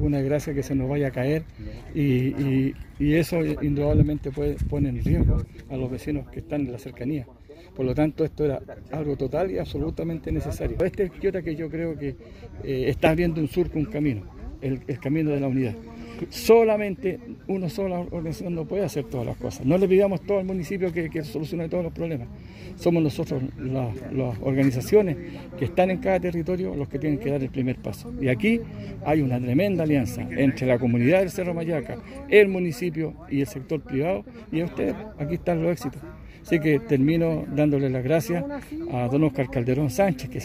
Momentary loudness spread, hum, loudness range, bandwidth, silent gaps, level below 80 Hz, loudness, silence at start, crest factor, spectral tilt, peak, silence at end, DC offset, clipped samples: 11 LU; none; 5 LU; 16 kHz; none; -40 dBFS; -25 LUFS; 0 s; 22 dB; -7.5 dB/octave; -4 dBFS; 0 s; under 0.1%; under 0.1%